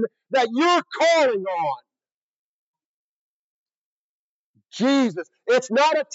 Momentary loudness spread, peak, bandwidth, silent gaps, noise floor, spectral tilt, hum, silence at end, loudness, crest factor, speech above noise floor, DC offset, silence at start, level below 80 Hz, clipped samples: 10 LU; -8 dBFS; 8 kHz; 2.12-2.73 s, 2.85-3.66 s, 3.75-4.54 s; under -90 dBFS; -3.5 dB/octave; none; 0 s; -21 LUFS; 16 dB; over 70 dB; under 0.1%; 0 s; under -90 dBFS; under 0.1%